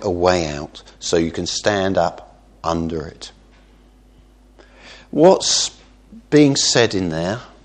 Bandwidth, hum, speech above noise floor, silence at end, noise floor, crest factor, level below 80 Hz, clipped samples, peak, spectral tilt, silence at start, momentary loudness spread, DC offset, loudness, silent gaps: 9.8 kHz; none; 31 dB; 0.15 s; -49 dBFS; 20 dB; -44 dBFS; under 0.1%; 0 dBFS; -4 dB/octave; 0 s; 15 LU; under 0.1%; -18 LUFS; none